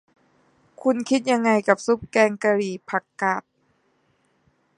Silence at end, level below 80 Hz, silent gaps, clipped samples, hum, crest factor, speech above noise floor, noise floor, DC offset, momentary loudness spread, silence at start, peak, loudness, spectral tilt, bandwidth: 1.35 s; -64 dBFS; none; under 0.1%; none; 22 dB; 45 dB; -66 dBFS; under 0.1%; 7 LU; 0.8 s; -2 dBFS; -22 LUFS; -5 dB/octave; 11.5 kHz